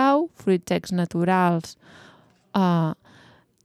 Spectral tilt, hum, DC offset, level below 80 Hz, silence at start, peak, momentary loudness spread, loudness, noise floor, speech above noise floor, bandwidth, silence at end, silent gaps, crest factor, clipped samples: -7 dB/octave; none; under 0.1%; -64 dBFS; 0 s; -8 dBFS; 8 LU; -23 LUFS; -54 dBFS; 32 dB; 13 kHz; 0.7 s; none; 16 dB; under 0.1%